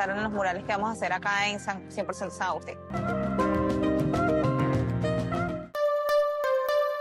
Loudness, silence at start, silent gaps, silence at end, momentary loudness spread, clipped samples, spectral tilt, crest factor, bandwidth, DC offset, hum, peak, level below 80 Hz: -28 LUFS; 0 s; none; 0 s; 8 LU; under 0.1%; -6 dB/octave; 14 dB; 16 kHz; under 0.1%; none; -14 dBFS; -48 dBFS